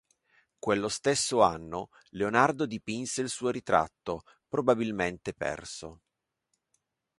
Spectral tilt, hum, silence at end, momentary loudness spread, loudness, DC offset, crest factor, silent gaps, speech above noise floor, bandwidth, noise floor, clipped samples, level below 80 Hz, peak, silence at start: -4 dB/octave; none; 1.25 s; 14 LU; -29 LUFS; under 0.1%; 24 dB; none; 51 dB; 11.5 kHz; -80 dBFS; under 0.1%; -60 dBFS; -8 dBFS; 0.65 s